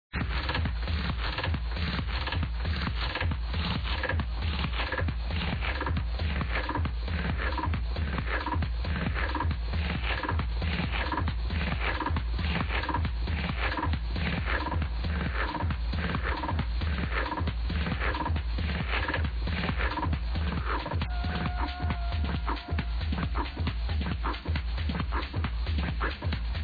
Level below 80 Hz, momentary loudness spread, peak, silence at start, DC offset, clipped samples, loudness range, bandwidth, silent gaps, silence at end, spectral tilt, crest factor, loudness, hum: -32 dBFS; 2 LU; -16 dBFS; 0.15 s; under 0.1%; under 0.1%; 1 LU; 5 kHz; none; 0 s; -8 dB/octave; 14 dB; -31 LUFS; none